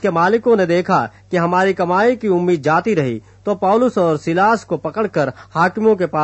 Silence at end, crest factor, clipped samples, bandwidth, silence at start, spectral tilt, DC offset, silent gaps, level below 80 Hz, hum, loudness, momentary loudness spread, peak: 0 s; 14 dB; under 0.1%; 8.4 kHz; 0 s; -7 dB/octave; under 0.1%; none; -56 dBFS; none; -16 LUFS; 6 LU; -2 dBFS